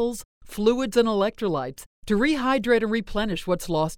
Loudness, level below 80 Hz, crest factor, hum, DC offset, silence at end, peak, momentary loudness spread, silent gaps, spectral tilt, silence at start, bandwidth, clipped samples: -24 LUFS; -44 dBFS; 18 dB; none; under 0.1%; 0 s; -6 dBFS; 11 LU; 0.25-0.41 s, 1.86-2.02 s; -5 dB/octave; 0 s; 17.5 kHz; under 0.1%